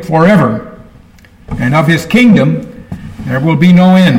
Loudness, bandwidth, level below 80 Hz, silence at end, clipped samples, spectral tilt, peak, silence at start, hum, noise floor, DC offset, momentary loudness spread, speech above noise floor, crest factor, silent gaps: -9 LUFS; 15.5 kHz; -36 dBFS; 0 s; under 0.1%; -7.5 dB/octave; 0 dBFS; 0 s; none; -39 dBFS; under 0.1%; 18 LU; 32 dB; 10 dB; none